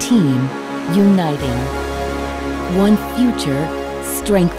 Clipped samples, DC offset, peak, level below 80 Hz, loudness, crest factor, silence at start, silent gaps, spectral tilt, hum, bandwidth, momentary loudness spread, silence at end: under 0.1%; under 0.1%; -2 dBFS; -32 dBFS; -17 LUFS; 14 dB; 0 s; none; -6 dB/octave; none; 16 kHz; 9 LU; 0 s